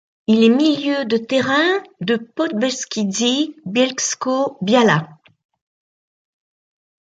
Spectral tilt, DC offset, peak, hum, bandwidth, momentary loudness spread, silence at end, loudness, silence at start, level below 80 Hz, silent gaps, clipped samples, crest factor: -4 dB/octave; under 0.1%; -2 dBFS; none; 9.2 kHz; 8 LU; 1.95 s; -18 LUFS; 0.3 s; -64 dBFS; none; under 0.1%; 18 dB